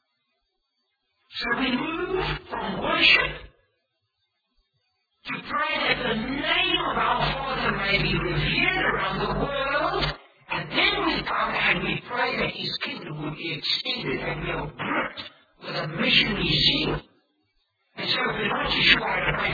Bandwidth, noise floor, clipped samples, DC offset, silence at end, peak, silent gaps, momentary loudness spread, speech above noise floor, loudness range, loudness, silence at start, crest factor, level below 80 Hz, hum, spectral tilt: 5 kHz; -76 dBFS; under 0.1%; under 0.1%; 0 s; -2 dBFS; none; 13 LU; 51 dB; 4 LU; -24 LUFS; 1.3 s; 24 dB; -44 dBFS; none; -5.5 dB/octave